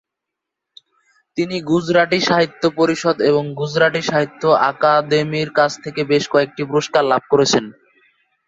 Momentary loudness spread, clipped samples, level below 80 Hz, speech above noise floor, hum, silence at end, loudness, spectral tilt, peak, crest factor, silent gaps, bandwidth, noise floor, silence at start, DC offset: 6 LU; under 0.1%; -58 dBFS; 65 dB; none; 0.75 s; -17 LUFS; -4.5 dB/octave; 0 dBFS; 16 dB; none; 8 kHz; -82 dBFS; 1.35 s; under 0.1%